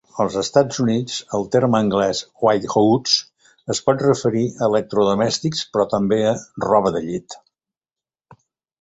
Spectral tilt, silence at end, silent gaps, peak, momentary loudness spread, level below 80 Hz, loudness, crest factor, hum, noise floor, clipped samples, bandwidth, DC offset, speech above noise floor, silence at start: -5 dB/octave; 1.45 s; none; -2 dBFS; 8 LU; -54 dBFS; -19 LUFS; 18 dB; none; under -90 dBFS; under 0.1%; 8.2 kHz; under 0.1%; over 71 dB; 0.15 s